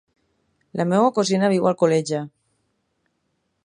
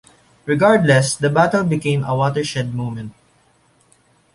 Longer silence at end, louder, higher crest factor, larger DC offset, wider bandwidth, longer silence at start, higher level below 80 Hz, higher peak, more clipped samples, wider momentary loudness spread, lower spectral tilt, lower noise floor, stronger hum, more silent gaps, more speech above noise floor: first, 1.4 s vs 1.25 s; second, -20 LUFS vs -17 LUFS; about the same, 18 dB vs 16 dB; neither; about the same, 11 kHz vs 11.5 kHz; first, 0.75 s vs 0.45 s; second, -70 dBFS vs -54 dBFS; about the same, -4 dBFS vs -2 dBFS; neither; second, 11 LU vs 14 LU; about the same, -6 dB/octave vs -5.5 dB/octave; first, -72 dBFS vs -57 dBFS; neither; neither; first, 53 dB vs 40 dB